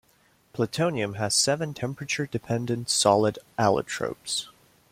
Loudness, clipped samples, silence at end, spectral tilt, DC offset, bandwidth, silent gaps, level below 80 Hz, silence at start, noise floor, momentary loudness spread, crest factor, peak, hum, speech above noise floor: -26 LUFS; under 0.1%; 0.4 s; -3.5 dB/octave; under 0.1%; 16.5 kHz; none; -62 dBFS; 0.55 s; -63 dBFS; 10 LU; 22 dB; -4 dBFS; none; 37 dB